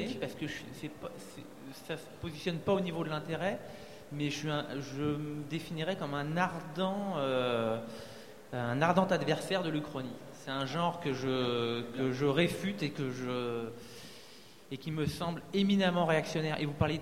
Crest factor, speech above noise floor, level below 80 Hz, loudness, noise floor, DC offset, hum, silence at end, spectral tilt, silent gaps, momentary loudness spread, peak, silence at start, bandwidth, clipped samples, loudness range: 22 dB; 21 dB; -62 dBFS; -34 LUFS; -55 dBFS; 0.2%; none; 0 s; -6 dB/octave; none; 17 LU; -12 dBFS; 0 s; 16 kHz; under 0.1%; 5 LU